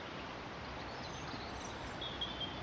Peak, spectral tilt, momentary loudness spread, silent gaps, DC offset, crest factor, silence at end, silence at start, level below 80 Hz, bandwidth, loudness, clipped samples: -28 dBFS; -4 dB/octave; 5 LU; none; under 0.1%; 16 dB; 0 s; 0 s; -58 dBFS; 10 kHz; -43 LUFS; under 0.1%